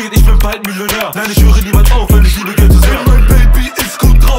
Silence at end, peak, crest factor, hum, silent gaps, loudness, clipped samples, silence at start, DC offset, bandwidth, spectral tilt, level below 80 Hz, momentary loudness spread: 0 s; 0 dBFS; 6 dB; none; none; -10 LUFS; under 0.1%; 0 s; under 0.1%; 16.5 kHz; -5 dB/octave; -8 dBFS; 6 LU